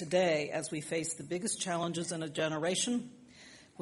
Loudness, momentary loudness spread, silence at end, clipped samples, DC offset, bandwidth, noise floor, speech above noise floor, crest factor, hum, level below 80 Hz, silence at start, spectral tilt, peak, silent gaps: -34 LUFS; 21 LU; 0.15 s; under 0.1%; under 0.1%; 11.5 kHz; -56 dBFS; 22 dB; 18 dB; none; -74 dBFS; 0 s; -3.5 dB/octave; -16 dBFS; none